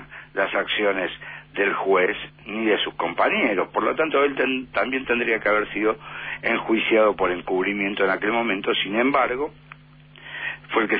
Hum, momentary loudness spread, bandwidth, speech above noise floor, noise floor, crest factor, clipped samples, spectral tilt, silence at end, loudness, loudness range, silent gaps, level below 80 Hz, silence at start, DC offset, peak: none; 10 LU; 4.9 kHz; 26 dB; -48 dBFS; 16 dB; under 0.1%; -8 dB/octave; 0 s; -22 LUFS; 2 LU; none; -56 dBFS; 0 s; under 0.1%; -8 dBFS